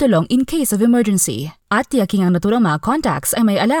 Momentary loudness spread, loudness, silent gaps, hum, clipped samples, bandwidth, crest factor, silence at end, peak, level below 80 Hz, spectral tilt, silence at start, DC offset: 4 LU; -16 LUFS; none; none; under 0.1%; 19 kHz; 12 dB; 0 s; -4 dBFS; -46 dBFS; -5 dB/octave; 0 s; under 0.1%